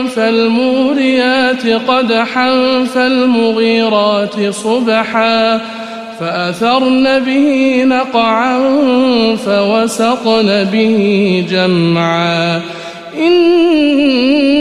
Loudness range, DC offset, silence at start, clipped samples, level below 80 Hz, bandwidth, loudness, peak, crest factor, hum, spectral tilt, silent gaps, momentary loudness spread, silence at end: 2 LU; 0.3%; 0 s; under 0.1%; -54 dBFS; 12.5 kHz; -11 LUFS; 0 dBFS; 10 dB; none; -5.5 dB/octave; none; 6 LU; 0 s